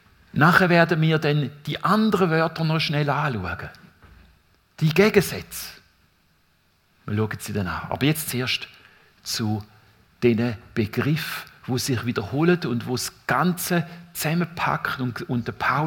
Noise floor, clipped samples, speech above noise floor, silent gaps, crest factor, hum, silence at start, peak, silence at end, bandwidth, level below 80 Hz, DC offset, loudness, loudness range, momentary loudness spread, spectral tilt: -63 dBFS; under 0.1%; 41 dB; none; 22 dB; none; 0.35 s; 0 dBFS; 0 s; 18 kHz; -56 dBFS; under 0.1%; -23 LUFS; 6 LU; 14 LU; -5.5 dB/octave